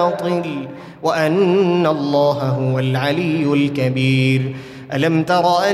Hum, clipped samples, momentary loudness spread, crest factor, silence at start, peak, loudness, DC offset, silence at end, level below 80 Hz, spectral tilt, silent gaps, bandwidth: none; under 0.1%; 10 LU; 14 dB; 0 s; -4 dBFS; -17 LUFS; under 0.1%; 0 s; -58 dBFS; -7 dB/octave; none; 13.5 kHz